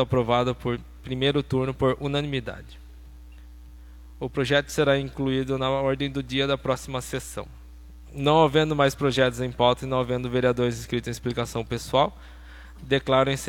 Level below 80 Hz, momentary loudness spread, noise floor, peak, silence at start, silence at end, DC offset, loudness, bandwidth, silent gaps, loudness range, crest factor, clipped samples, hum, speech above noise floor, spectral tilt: -44 dBFS; 12 LU; -44 dBFS; -6 dBFS; 0 s; 0 s; under 0.1%; -25 LUFS; 17 kHz; none; 5 LU; 20 dB; under 0.1%; none; 20 dB; -5.5 dB/octave